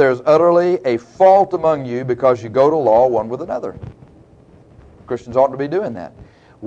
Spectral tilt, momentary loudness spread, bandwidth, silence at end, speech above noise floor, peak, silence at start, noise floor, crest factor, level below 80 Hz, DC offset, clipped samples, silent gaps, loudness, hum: -7.5 dB/octave; 16 LU; 7.8 kHz; 0 s; 31 dB; -2 dBFS; 0 s; -46 dBFS; 16 dB; -52 dBFS; under 0.1%; under 0.1%; none; -16 LUFS; none